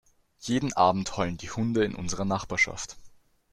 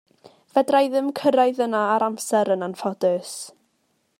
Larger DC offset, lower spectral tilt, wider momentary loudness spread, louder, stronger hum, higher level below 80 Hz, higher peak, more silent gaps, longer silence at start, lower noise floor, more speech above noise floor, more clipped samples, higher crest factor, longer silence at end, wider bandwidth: neither; about the same, -4.5 dB/octave vs -4.5 dB/octave; about the same, 10 LU vs 9 LU; second, -27 LUFS vs -22 LUFS; neither; first, -52 dBFS vs -76 dBFS; about the same, -8 dBFS vs -6 dBFS; neither; second, 0.4 s vs 0.55 s; second, -52 dBFS vs -69 dBFS; second, 25 dB vs 48 dB; neither; about the same, 20 dB vs 16 dB; second, 0.45 s vs 0.7 s; second, 13 kHz vs 16 kHz